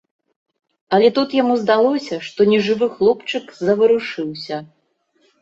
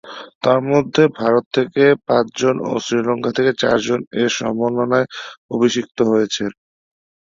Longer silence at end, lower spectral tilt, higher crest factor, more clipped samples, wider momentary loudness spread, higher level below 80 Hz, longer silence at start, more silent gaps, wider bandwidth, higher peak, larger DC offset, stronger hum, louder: about the same, 0.75 s vs 0.85 s; about the same, -6 dB/octave vs -5 dB/octave; about the same, 16 dB vs 16 dB; neither; first, 12 LU vs 7 LU; second, -62 dBFS vs -56 dBFS; first, 0.9 s vs 0.05 s; second, none vs 0.35-0.41 s, 1.46-1.51 s, 4.07-4.11 s, 5.37-5.49 s; about the same, 7.8 kHz vs 7.6 kHz; about the same, -2 dBFS vs -2 dBFS; neither; neither; about the same, -17 LUFS vs -17 LUFS